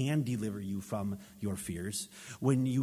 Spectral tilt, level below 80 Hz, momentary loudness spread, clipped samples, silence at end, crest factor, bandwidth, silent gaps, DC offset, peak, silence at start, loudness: -6 dB/octave; -58 dBFS; 9 LU; under 0.1%; 0 s; 18 dB; 16 kHz; none; under 0.1%; -16 dBFS; 0 s; -35 LUFS